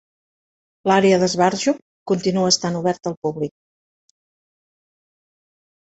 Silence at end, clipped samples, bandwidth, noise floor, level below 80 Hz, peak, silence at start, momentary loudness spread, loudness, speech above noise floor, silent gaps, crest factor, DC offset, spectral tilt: 2.35 s; under 0.1%; 8.2 kHz; under -90 dBFS; -62 dBFS; -2 dBFS; 0.85 s; 11 LU; -19 LUFS; over 71 dB; 1.82-2.06 s, 3.17-3.22 s; 20 dB; under 0.1%; -4.5 dB/octave